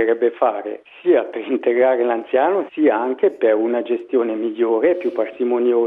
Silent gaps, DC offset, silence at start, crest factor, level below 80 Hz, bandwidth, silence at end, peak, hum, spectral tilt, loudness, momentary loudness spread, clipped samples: none; under 0.1%; 0 s; 14 dB; -70 dBFS; 3.9 kHz; 0 s; -4 dBFS; none; -8 dB/octave; -19 LUFS; 6 LU; under 0.1%